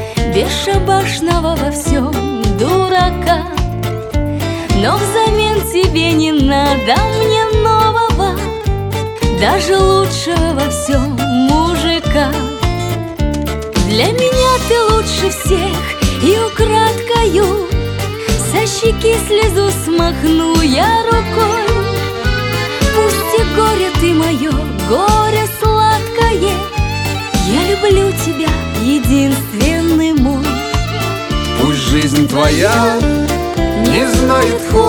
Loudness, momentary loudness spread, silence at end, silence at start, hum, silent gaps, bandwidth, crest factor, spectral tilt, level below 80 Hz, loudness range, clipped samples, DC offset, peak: -13 LUFS; 6 LU; 0 s; 0 s; none; none; 19 kHz; 12 dB; -5 dB/octave; -22 dBFS; 2 LU; under 0.1%; under 0.1%; 0 dBFS